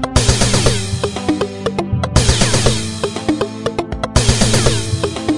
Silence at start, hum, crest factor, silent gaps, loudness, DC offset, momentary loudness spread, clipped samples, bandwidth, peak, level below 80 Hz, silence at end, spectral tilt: 0 s; none; 16 dB; none; -16 LUFS; 4%; 7 LU; under 0.1%; 11.5 kHz; 0 dBFS; -24 dBFS; 0 s; -4 dB/octave